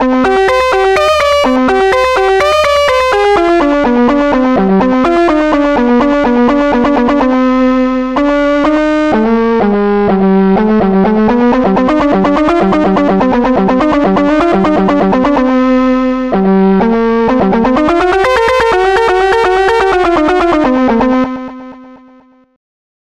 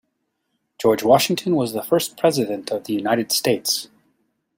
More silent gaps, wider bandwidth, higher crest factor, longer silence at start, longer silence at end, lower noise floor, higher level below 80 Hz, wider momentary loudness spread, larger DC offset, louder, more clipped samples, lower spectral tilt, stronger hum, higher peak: neither; second, 12 kHz vs 16.5 kHz; second, 8 dB vs 20 dB; second, 0 s vs 0.8 s; first, 1.05 s vs 0.75 s; second, -43 dBFS vs -74 dBFS; first, -32 dBFS vs -62 dBFS; second, 2 LU vs 8 LU; first, 0.6% vs under 0.1%; first, -10 LUFS vs -20 LUFS; neither; first, -6.5 dB/octave vs -4 dB/octave; neither; about the same, 0 dBFS vs -2 dBFS